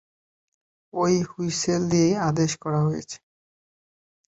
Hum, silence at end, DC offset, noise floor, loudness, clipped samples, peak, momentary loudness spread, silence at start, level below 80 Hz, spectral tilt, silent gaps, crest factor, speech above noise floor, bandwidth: none; 1.2 s; under 0.1%; under -90 dBFS; -24 LUFS; under 0.1%; -10 dBFS; 13 LU; 0.95 s; -58 dBFS; -5.5 dB/octave; none; 16 dB; over 67 dB; 8.2 kHz